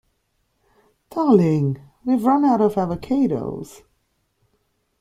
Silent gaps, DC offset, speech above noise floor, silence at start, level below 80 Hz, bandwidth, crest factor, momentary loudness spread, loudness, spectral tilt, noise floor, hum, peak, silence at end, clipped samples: none; under 0.1%; 51 dB; 1.15 s; -56 dBFS; 14.5 kHz; 18 dB; 15 LU; -20 LUFS; -9 dB/octave; -69 dBFS; none; -2 dBFS; 1.35 s; under 0.1%